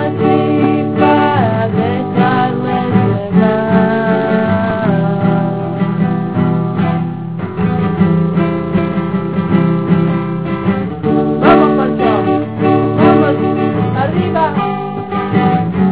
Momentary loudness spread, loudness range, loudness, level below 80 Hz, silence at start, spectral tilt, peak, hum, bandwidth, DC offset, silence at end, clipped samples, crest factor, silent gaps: 6 LU; 3 LU; -13 LUFS; -38 dBFS; 0 s; -12 dB/octave; 0 dBFS; none; 4 kHz; 0.9%; 0 s; under 0.1%; 12 dB; none